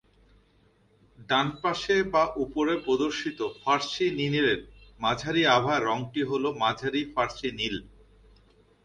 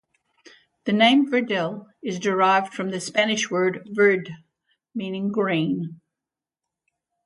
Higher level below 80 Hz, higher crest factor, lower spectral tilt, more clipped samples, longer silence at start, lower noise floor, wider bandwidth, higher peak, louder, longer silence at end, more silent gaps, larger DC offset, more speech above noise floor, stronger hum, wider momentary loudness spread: first, -56 dBFS vs -72 dBFS; about the same, 20 dB vs 18 dB; about the same, -4.5 dB/octave vs -4.5 dB/octave; neither; first, 1.2 s vs 0.85 s; second, -63 dBFS vs -88 dBFS; second, 9.8 kHz vs 11 kHz; about the same, -8 dBFS vs -6 dBFS; second, -27 LUFS vs -22 LUFS; second, 1 s vs 1.3 s; neither; neither; second, 37 dB vs 66 dB; neither; second, 8 LU vs 15 LU